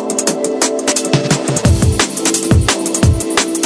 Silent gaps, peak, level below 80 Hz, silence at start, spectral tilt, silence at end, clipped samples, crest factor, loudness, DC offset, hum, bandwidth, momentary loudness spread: none; 0 dBFS; -24 dBFS; 0 s; -4 dB/octave; 0 s; under 0.1%; 14 dB; -14 LUFS; under 0.1%; none; 11 kHz; 3 LU